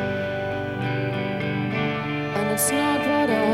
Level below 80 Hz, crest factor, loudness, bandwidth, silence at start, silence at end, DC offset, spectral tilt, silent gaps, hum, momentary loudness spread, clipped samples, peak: -54 dBFS; 14 dB; -24 LUFS; 16 kHz; 0 s; 0 s; under 0.1%; -4.5 dB/octave; none; 50 Hz at -45 dBFS; 6 LU; under 0.1%; -8 dBFS